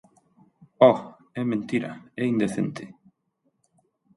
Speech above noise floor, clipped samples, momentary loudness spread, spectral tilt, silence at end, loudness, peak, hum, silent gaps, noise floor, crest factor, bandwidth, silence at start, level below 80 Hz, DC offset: 50 dB; under 0.1%; 19 LU; -7 dB/octave; 1.3 s; -24 LUFS; -4 dBFS; none; none; -73 dBFS; 22 dB; 11.5 kHz; 0.8 s; -68 dBFS; under 0.1%